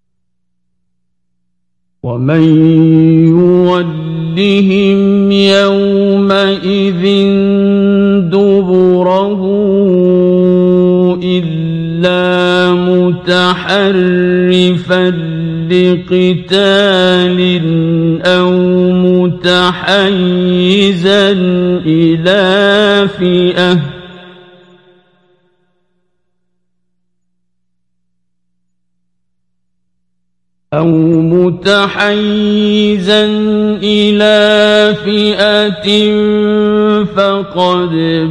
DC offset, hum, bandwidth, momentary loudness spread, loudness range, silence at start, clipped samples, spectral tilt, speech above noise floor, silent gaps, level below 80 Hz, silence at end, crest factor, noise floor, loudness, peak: under 0.1%; 60 Hz at -30 dBFS; 10.5 kHz; 5 LU; 3 LU; 2.05 s; under 0.1%; -7 dB/octave; 62 dB; none; -46 dBFS; 0 s; 10 dB; -71 dBFS; -9 LUFS; 0 dBFS